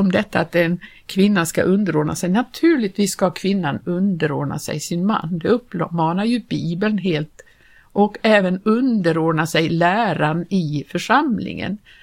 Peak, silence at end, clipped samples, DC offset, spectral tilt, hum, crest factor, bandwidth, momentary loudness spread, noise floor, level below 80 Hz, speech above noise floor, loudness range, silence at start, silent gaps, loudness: 0 dBFS; 0.25 s; under 0.1%; under 0.1%; -6 dB/octave; none; 18 dB; 16.5 kHz; 8 LU; -47 dBFS; -54 dBFS; 28 dB; 3 LU; 0 s; none; -19 LUFS